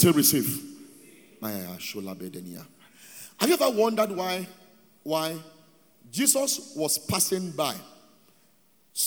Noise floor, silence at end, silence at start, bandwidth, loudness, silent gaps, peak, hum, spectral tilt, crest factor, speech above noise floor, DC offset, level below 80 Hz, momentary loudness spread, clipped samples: -64 dBFS; 0 s; 0 s; over 20 kHz; -26 LUFS; none; -4 dBFS; none; -3.5 dB/octave; 24 dB; 38 dB; under 0.1%; -68 dBFS; 21 LU; under 0.1%